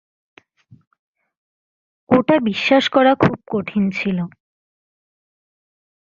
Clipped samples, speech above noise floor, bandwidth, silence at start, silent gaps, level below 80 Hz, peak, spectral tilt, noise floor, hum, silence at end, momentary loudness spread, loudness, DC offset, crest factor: under 0.1%; 33 dB; 7.6 kHz; 2.1 s; none; -56 dBFS; -2 dBFS; -6.5 dB/octave; -50 dBFS; none; 1.8 s; 10 LU; -17 LUFS; under 0.1%; 20 dB